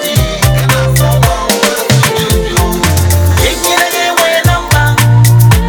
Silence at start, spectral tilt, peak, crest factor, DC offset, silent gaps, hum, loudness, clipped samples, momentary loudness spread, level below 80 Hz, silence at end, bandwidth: 0 s; -4.5 dB/octave; 0 dBFS; 8 dB; under 0.1%; none; none; -9 LUFS; 0.3%; 4 LU; -20 dBFS; 0 s; over 20 kHz